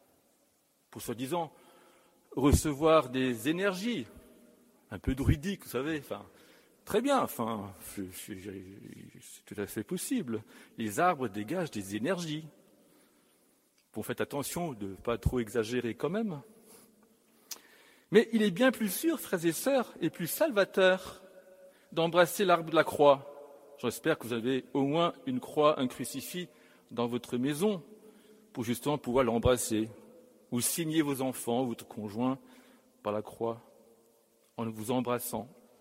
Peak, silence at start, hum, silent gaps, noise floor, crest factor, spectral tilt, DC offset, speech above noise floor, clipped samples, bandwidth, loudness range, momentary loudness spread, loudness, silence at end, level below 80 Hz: -8 dBFS; 0.9 s; none; none; -71 dBFS; 24 dB; -5 dB/octave; under 0.1%; 40 dB; under 0.1%; 16 kHz; 8 LU; 17 LU; -31 LUFS; 0.3 s; -50 dBFS